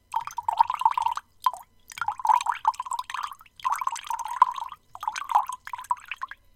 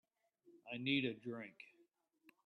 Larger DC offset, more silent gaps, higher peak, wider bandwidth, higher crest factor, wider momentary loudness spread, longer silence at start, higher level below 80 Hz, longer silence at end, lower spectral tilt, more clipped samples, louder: neither; neither; first, -4 dBFS vs -24 dBFS; first, 17 kHz vs 4.7 kHz; about the same, 24 dB vs 22 dB; second, 13 LU vs 23 LU; second, 0.1 s vs 0.45 s; first, -66 dBFS vs -84 dBFS; second, 0.2 s vs 0.8 s; second, 1 dB/octave vs -7 dB/octave; neither; first, -28 LUFS vs -42 LUFS